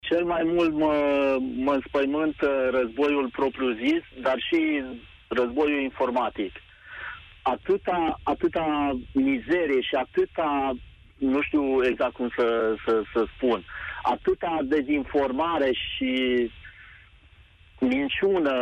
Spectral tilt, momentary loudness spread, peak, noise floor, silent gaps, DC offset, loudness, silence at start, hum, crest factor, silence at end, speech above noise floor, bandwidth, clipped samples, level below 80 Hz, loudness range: -6.5 dB/octave; 7 LU; -14 dBFS; -54 dBFS; none; under 0.1%; -25 LUFS; 0.05 s; none; 12 dB; 0 s; 29 dB; 8 kHz; under 0.1%; -50 dBFS; 3 LU